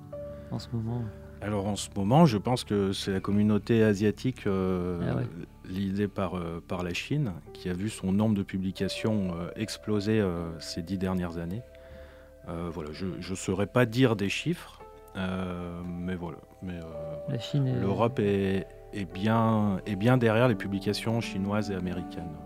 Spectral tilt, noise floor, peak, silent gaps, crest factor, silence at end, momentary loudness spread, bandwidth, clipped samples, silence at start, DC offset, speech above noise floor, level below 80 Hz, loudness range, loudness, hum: -6.5 dB/octave; -49 dBFS; -6 dBFS; none; 22 dB; 0 s; 14 LU; 15.5 kHz; under 0.1%; 0 s; under 0.1%; 20 dB; -52 dBFS; 6 LU; -29 LUFS; none